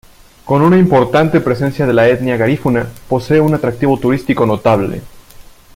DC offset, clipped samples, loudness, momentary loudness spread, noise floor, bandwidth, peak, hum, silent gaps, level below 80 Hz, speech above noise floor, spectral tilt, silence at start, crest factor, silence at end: under 0.1%; under 0.1%; -13 LUFS; 7 LU; -38 dBFS; 16.5 kHz; 0 dBFS; none; none; -40 dBFS; 26 dB; -8 dB/octave; 0.45 s; 12 dB; 0.35 s